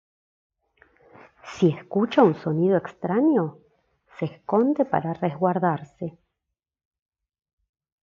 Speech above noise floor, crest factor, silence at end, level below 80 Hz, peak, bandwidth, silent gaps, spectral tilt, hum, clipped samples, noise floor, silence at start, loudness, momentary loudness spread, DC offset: 62 dB; 20 dB; 1.95 s; -70 dBFS; -6 dBFS; 7.4 kHz; none; -8.5 dB/octave; none; under 0.1%; -84 dBFS; 1.45 s; -23 LUFS; 13 LU; under 0.1%